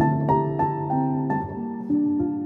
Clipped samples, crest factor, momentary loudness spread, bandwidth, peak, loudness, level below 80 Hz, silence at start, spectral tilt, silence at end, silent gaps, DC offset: under 0.1%; 14 dB; 6 LU; 4 kHz; -8 dBFS; -24 LUFS; -52 dBFS; 0 s; -11.5 dB/octave; 0 s; none; under 0.1%